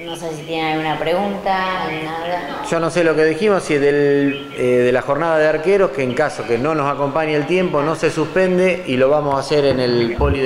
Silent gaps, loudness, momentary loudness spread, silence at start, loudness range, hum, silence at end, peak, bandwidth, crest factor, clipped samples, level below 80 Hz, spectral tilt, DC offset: none; -17 LUFS; 7 LU; 0 s; 2 LU; none; 0 s; -2 dBFS; 14.5 kHz; 16 dB; under 0.1%; -38 dBFS; -6 dB/octave; under 0.1%